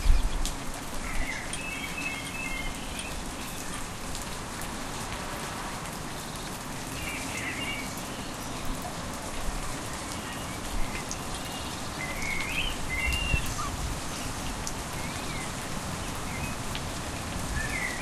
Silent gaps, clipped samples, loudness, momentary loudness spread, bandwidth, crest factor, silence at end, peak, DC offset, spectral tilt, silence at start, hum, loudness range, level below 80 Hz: none; under 0.1%; -33 LUFS; 6 LU; 15.5 kHz; 24 dB; 0 s; -8 dBFS; under 0.1%; -3 dB/octave; 0 s; none; 4 LU; -36 dBFS